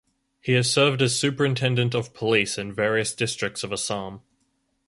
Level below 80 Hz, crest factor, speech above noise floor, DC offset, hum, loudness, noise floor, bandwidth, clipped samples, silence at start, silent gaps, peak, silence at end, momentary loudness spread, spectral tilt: -60 dBFS; 20 dB; 47 dB; under 0.1%; none; -23 LUFS; -71 dBFS; 11.5 kHz; under 0.1%; 0.45 s; none; -6 dBFS; 0.7 s; 9 LU; -4 dB/octave